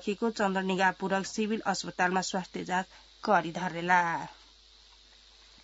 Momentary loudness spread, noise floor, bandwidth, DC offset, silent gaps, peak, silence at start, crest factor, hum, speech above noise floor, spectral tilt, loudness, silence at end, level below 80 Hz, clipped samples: 9 LU; -58 dBFS; 8 kHz; under 0.1%; none; -10 dBFS; 0 s; 20 dB; none; 28 dB; -3 dB/octave; -30 LUFS; 1.3 s; -64 dBFS; under 0.1%